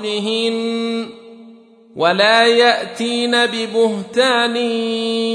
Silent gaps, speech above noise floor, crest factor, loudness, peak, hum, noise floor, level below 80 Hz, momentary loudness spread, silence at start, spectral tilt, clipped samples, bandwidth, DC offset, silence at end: none; 27 dB; 16 dB; -16 LUFS; -2 dBFS; none; -43 dBFS; -70 dBFS; 9 LU; 0 s; -3.5 dB/octave; under 0.1%; 11 kHz; under 0.1%; 0 s